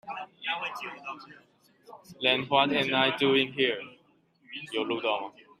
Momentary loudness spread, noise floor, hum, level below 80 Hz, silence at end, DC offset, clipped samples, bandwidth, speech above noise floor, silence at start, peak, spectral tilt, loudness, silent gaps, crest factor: 18 LU; -65 dBFS; none; -74 dBFS; 0.3 s; under 0.1%; under 0.1%; 14 kHz; 36 dB; 0.05 s; -8 dBFS; -5 dB/octave; -27 LUFS; none; 22 dB